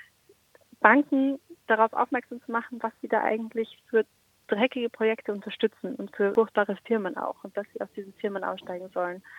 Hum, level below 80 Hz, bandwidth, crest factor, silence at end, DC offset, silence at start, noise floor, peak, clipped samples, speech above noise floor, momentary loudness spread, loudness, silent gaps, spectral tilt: none; -78 dBFS; 10.5 kHz; 26 dB; 0 s; under 0.1%; 0.8 s; -62 dBFS; -2 dBFS; under 0.1%; 35 dB; 13 LU; -28 LUFS; none; -6.5 dB/octave